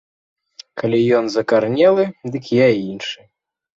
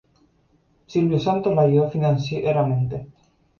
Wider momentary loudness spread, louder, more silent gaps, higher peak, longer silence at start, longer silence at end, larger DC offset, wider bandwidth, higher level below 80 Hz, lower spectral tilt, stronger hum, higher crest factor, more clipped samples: first, 14 LU vs 8 LU; first, -17 LUFS vs -21 LUFS; neither; first, -2 dBFS vs -6 dBFS; second, 0.75 s vs 0.9 s; about the same, 0.6 s vs 0.55 s; neither; first, 7.8 kHz vs 7 kHz; second, -60 dBFS vs -54 dBFS; second, -6.5 dB/octave vs -8.5 dB/octave; neither; about the same, 16 dB vs 16 dB; neither